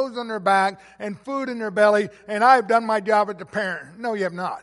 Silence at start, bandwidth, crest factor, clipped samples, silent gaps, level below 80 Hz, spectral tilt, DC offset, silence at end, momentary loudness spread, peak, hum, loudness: 0 s; 11.5 kHz; 18 dB; under 0.1%; none; -68 dBFS; -5 dB/octave; under 0.1%; 0 s; 12 LU; -2 dBFS; none; -21 LUFS